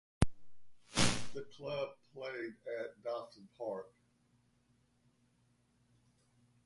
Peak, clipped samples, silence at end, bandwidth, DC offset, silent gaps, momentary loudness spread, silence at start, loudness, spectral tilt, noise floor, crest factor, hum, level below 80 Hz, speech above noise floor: -12 dBFS; under 0.1%; 2.8 s; 11.5 kHz; under 0.1%; none; 14 LU; 0.2 s; -40 LUFS; -4 dB/octave; -74 dBFS; 28 dB; 60 Hz at -70 dBFS; -52 dBFS; 30 dB